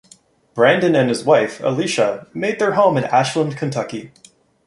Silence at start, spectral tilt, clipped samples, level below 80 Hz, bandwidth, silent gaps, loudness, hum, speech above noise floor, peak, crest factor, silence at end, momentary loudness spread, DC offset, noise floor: 0.55 s; -5.5 dB/octave; under 0.1%; -60 dBFS; 11.5 kHz; none; -17 LUFS; none; 34 dB; -2 dBFS; 16 dB; 0.6 s; 9 LU; under 0.1%; -51 dBFS